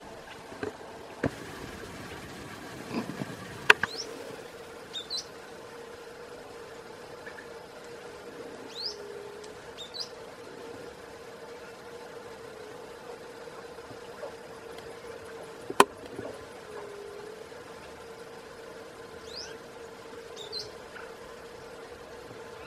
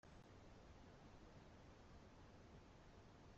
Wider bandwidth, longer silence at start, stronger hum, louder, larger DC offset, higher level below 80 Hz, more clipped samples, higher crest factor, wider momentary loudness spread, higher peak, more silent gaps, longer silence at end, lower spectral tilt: first, 16 kHz vs 8.2 kHz; about the same, 0 s vs 0.05 s; neither; first, -36 LUFS vs -65 LUFS; neither; first, -64 dBFS vs -70 dBFS; neither; first, 38 dB vs 14 dB; first, 10 LU vs 1 LU; first, 0 dBFS vs -50 dBFS; neither; about the same, 0 s vs 0 s; second, -3 dB/octave vs -5.5 dB/octave